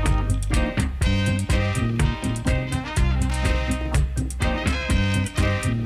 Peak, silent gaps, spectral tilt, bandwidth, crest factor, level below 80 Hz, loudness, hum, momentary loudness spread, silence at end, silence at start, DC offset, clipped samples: -8 dBFS; none; -5.5 dB/octave; 14 kHz; 14 dB; -26 dBFS; -23 LUFS; none; 3 LU; 0 s; 0 s; under 0.1%; under 0.1%